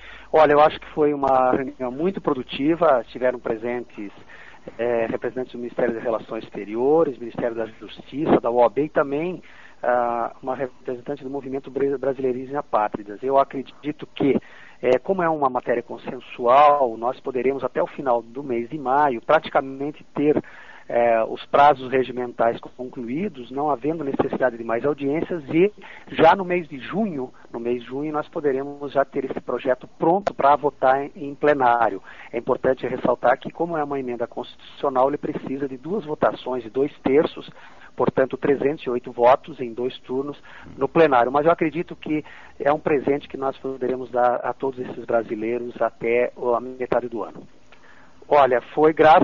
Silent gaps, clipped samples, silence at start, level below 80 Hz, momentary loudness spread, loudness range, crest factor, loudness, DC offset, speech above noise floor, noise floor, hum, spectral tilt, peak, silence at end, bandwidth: none; under 0.1%; 0 s; -58 dBFS; 13 LU; 4 LU; 16 dB; -22 LUFS; 0.5%; 29 dB; -51 dBFS; none; -4.5 dB/octave; -6 dBFS; 0 s; 7.2 kHz